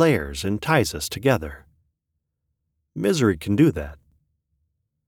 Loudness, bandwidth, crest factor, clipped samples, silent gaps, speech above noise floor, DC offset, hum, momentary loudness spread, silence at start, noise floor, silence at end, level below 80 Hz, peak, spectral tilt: -22 LUFS; 19.5 kHz; 20 dB; under 0.1%; none; 58 dB; under 0.1%; none; 15 LU; 0 s; -79 dBFS; 1.15 s; -44 dBFS; -4 dBFS; -5.5 dB/octave